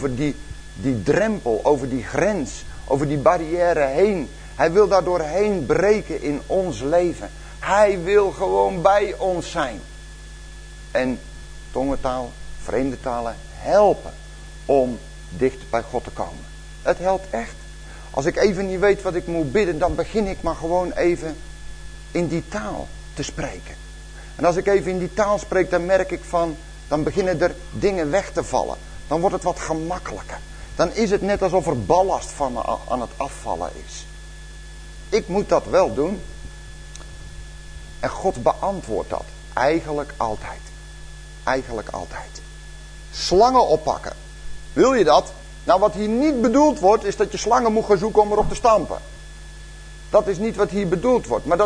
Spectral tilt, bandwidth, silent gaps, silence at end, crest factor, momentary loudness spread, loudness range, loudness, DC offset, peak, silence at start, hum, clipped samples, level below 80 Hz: -5.5 dB/octave; 10.5 kHz; none; 0 s; 20 dB; 22 LU; 8 LU; -21 LUFS; under 0.1%; -2 dBFS; 0 s; none; under 0.1%; -38 dBFS